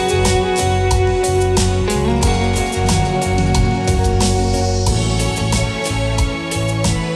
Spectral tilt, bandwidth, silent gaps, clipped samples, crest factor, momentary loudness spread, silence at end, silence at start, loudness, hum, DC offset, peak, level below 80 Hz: -5 dB/octave; 13.5 kHz; none; under 0.1%; 12 dB; 3 LU; 0 s; 0 s; -16 LUFS; none; under 0.1%; -4 dBFS; -22 dBFS